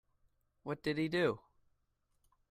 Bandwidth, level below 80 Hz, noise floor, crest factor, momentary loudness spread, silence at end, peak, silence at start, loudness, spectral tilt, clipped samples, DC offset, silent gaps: 14 kHz; -72 dBFS; -79 dBFS; 22 dB; 14 LU; 1.1 s; -18 dBFS; 0.65 s; -36 LUFS; -6.5 dB/octave; under 0.1%; under 0.1%; none